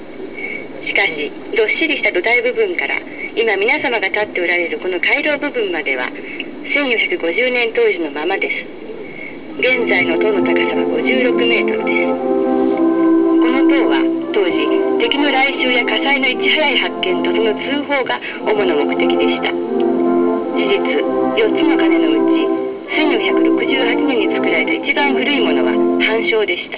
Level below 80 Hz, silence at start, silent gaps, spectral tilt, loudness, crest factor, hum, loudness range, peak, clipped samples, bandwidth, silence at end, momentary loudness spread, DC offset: -56 dBFS; 0 s; none; -7.5 dB/octave; -15 LUFS; 14 dB; none; 3 LU; -2 dBFS; under 0.1%; 4 kHz; 0 s; 7 LU; under 0.1%